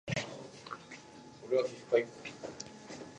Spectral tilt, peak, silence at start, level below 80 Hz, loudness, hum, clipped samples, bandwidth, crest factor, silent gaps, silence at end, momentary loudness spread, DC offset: -4.5 dB/octave; -14 dBFS; 0.05 s; -70 dBFS; -37 LUFS; none; under 0.1%; 10 kHz; 24 dB; none; 0 s; 18 LU; under 0.1%